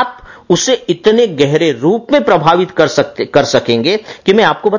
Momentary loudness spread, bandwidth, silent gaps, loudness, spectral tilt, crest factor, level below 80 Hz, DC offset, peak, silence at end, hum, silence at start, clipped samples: 5 LU; 7.4 kHz; none; -12 LUFS; -4.5 dB/octave; 12 dB; -48 dBFS; under 0.1%; 0 dBFS; 0 s; none; 0 s; 0.1%